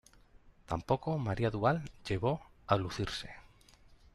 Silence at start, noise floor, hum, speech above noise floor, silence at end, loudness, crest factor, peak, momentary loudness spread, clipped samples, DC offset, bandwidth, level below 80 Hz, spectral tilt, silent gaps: 0.45 s; -61 dBFS; none; 27 dB; 0.75 s; -35 LUFS; 22 dB; -12 dBFS; 9 LU; under 0.1%; under 0.1%; 12.5 kHz; -56 dBFS; -6.5 dB/octave; none